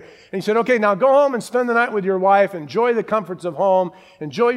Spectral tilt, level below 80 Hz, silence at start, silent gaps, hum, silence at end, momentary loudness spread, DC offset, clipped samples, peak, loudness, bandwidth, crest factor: -6 dB/octave; -70 dBFS; 0.05 s; none; none; 0 s; 12 LU; under 0.1%; under 0.1%; -2 dBFS; -18 LUFS; 13 kHz; 16 dB